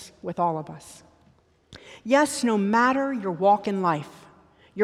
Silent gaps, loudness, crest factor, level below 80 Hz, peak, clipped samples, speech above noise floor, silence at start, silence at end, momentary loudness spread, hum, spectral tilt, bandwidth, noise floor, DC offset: none; -23 LUFS; 18 dB; -66 dBFS; -6 dBFS; under 0.1%; 37 dB; 0 s; 0 s; 20 LU; none; -5 dB/octave; 15 kHz; -60 dBFS; under 0.1%